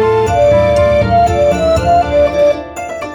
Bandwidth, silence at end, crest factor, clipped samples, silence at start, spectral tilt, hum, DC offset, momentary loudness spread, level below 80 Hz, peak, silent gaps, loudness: 18.5 kHz; 0 s; 10 dB; under 0.1%; 0 s; -6.5 dB/octave; none; under 0.1%; 6 LU; -26 dBFS; 0 dBFS; none; -11 LUFS